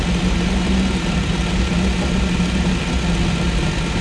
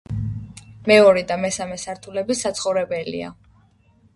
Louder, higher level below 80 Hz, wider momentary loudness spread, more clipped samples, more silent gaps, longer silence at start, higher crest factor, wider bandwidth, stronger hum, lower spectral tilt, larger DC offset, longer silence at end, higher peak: about the same, -19 LUFS vs -20 LUFS; first, -22 dBFS vs -48 dBFS; second, 1 LU vs 18 LU; neither; neither; about the same, 0 s vs 0.1 s; second, 12 dB vs 20 dB; about the same, 12 kHz vs 11.5 kHz; neither; first, -5.5 dB/octave vs -4 dB/octave; neither; second, 0 s vs 0.85 s; second, -6 dBFS vs -2 dBFS